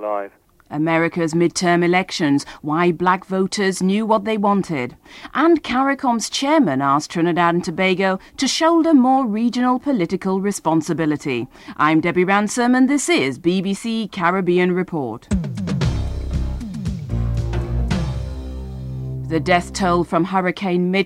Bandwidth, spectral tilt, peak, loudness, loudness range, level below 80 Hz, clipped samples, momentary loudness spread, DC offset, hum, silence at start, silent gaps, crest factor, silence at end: 13.5 kHz; -5.5 dB/octave; -2 dBFS; -19 LUFS; 6 LU; -34 dBFS; under 0.1%; 10 LU; under 0.1%; none; 0 s; none; 16 dB; 0 s